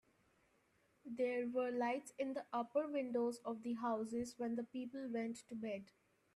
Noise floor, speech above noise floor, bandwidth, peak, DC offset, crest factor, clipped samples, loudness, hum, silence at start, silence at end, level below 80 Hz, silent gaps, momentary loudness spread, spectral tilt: -77 dBFS; 35 dB; 13 kHz; -26 dBFS; under 0.1%; 16 dB; under 0.1%; -42 LUFS; none; 1.05 s; 0.5 s; -82 dBFS; none; 8 LU; -5 dB/octave